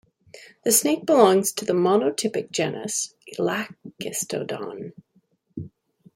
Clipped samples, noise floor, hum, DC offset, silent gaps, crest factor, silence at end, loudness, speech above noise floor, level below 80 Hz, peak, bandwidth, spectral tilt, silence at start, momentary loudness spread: under 0.1%; -65 dBFS; none; under 0.1%; none; 22 dB; 0.45 s; -22 LUFS; 42 dB; -68 dBFS; -2 dBFS; 16.5 kHz; -3.5 dB/octave; 0.35 s; 21 LU